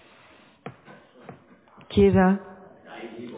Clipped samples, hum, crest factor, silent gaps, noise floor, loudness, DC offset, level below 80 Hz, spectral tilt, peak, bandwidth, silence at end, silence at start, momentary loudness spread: under 0.1%; none; 18 dB; none; -54 dBFS; -21 LUFS; under 0.1%; -44 dBFS; -11.5 dB/octave; -8 dBFS; 4 kHz; 0 s; 0.65 s; 26 LU